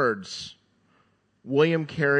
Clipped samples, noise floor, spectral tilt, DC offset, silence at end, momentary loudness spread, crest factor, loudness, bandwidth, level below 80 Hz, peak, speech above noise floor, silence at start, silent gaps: under 0.1%; -66 dBFS; -6 dB/octave; under 0.1%; 0 s; 14 LU; 20 dB; -25 LUFS; 9.6 kHz; -68 dBFS; -8 dBFS; 42 dB; 0 s; none